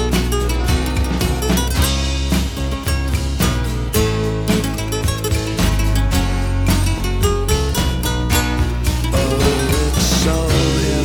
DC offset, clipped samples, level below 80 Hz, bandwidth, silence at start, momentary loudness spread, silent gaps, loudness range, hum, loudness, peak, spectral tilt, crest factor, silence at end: under 0.1%; under 0.1%; -20 dBFS; 19 kHz; 0 s; 4 LU; none; 2 LU; none; -18 LUFS; -2 dBFS; -5 dB/octave; 14 dB; 0 s